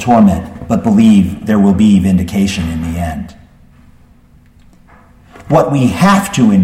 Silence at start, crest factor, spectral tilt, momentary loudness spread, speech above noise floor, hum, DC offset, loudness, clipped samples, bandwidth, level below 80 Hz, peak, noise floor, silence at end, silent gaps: 0 s; 12 dB; -7 dB/octave; 11 LU; 34 dB; none; under 0.1%; -11 LUFS; under 0.1%; 14.5 kHz; -34 dBFS; 0 dBFS; -44 dBFS; 0 s; none